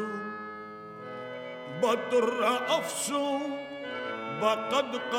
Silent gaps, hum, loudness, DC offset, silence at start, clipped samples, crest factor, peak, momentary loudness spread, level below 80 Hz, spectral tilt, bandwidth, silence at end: none; none; -30 LUFS; under 0.1%; 0 s; under 0.1%; 20 dB; -12 dBFS; 14 LU; -78 dBFS; -3 dB/octave; 17 kHz; 0 s